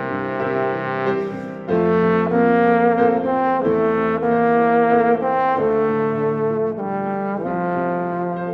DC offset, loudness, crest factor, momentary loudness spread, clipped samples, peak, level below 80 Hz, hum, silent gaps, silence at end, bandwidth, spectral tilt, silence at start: under 0.1%; -19 LUFS; 16 dB; 8 LU; under 0.1%; -4 dBFS; -54 dBFS; none; none; 0 s; 5.4 kHz; -9.5 dB/octave; 0 s